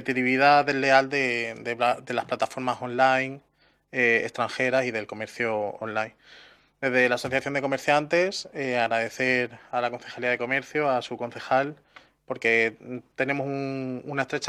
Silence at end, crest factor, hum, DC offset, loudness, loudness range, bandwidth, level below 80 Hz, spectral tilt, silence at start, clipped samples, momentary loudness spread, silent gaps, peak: 0 s; 22 dB; none; under 0.1%; -25 LUFS; 3 LU; 13.5 kHz; -70 dBFS; -4.5 dB/octave; 0 s; under 0.1%; 11 LU; none; -4 dBFS